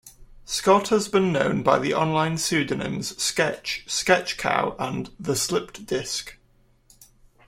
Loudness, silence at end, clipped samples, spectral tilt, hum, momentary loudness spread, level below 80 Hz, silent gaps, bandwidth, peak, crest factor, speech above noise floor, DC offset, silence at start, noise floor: -23 LUFS; 1.15 s; under 0.1%; -3.5 dB/octave; none; 10 LU; -54 dBFS; none; 16.5 kHz; -4 dBFS; 20 dB; 36 dB; under 0.1%; 0.05 s; -60 dBFS